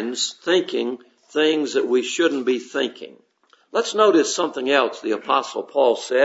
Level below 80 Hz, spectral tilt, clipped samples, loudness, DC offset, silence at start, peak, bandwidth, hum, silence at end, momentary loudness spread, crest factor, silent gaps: -78 dBFS; -2.5 dB/octave; under 0.1%; -21 LUFS; under 0.1%; 0 s; -2 dBFS; 8 kHz; none; 0 s; 10 LU; 18 dB; none